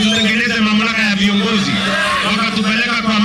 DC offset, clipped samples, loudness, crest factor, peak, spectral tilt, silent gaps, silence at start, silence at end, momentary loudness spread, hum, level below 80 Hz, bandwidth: under 0.1%; under 0.1%; -14 LUFS; 12 dB; -2 dBFS; -4 dB/octave; none; 0 s; 0 s; 2 LU; none; -44 dBFS; 13 kHz